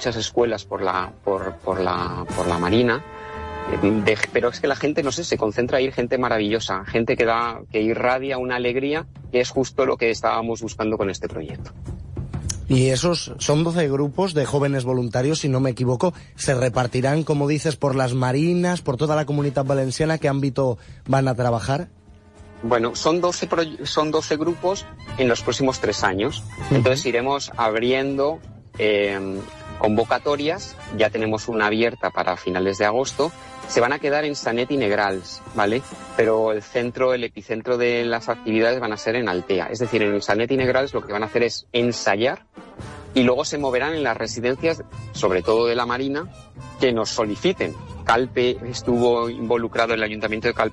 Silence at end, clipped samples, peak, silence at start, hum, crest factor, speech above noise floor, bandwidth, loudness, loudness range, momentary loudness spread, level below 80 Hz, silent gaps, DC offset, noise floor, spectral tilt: 0 s; under 0.1%; -6 dBFS; 0 s; none; 16 dB; 25 dB; 12 kHz; -22 LUFS; 2 LU; 8 LU; -48 dBFS; none; under 0.1%; -46 dBFS; -5 dB/octave